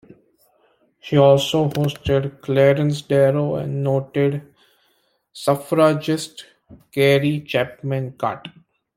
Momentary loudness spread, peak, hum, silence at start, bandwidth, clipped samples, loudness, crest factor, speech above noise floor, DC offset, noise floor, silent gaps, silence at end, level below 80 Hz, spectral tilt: 10 LU; -2 dBFS; none; 1.05 s; 16 kHz; under 0.1%; -19 LUFS; 18 dB; 46 dB; under 0.1%; -65 dBFS; none; 0.45 s; -52 dBFS; -6.5 dB/octave